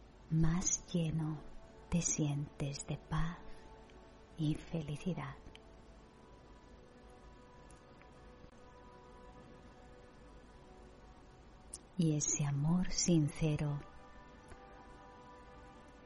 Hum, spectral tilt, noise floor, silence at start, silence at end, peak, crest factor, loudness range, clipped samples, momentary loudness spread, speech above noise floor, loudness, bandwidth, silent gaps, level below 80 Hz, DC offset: none; -5 dB/octave; -59 dBFS; 0 s; 0 s; -18 dBFS; 20 dB; 22 LU; under 0.1%; 25 LU; 23 dB; -37 LUFS; 11.5 kHz; none; -52 dBFS; under 0.1%